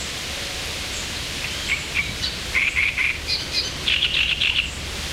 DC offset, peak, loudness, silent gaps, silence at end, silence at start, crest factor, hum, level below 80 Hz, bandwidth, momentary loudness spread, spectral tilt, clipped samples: under 0.1%; -6 dBFS; -21 LUFS; none; 0 s; 0 s; 18 dB; none; -38 dBFS; 16 kHz; 9 LU; -1.5 dB/octave; under 0.1%